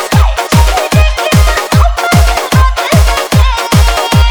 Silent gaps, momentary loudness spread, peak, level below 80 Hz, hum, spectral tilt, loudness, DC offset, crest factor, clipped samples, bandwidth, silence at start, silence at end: none; 1 LU; 0 dBFS; -12 dBFS; none; -5 dB/octave; -9 LUFS; under 0.1%; 8 dB; 0.9%; over 20 kHz; 0 s; 0 s